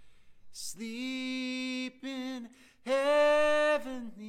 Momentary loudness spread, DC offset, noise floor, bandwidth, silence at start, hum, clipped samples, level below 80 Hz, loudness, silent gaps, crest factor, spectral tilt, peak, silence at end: 18 LU; under 0.1%; -51 dBFS; 15.5 kHz; 0 s; none; under 0.1%; -64 dBFS; -30 LUFS; none; 16 dB; -2.5 dB/octave; -16 dBFS; 0 s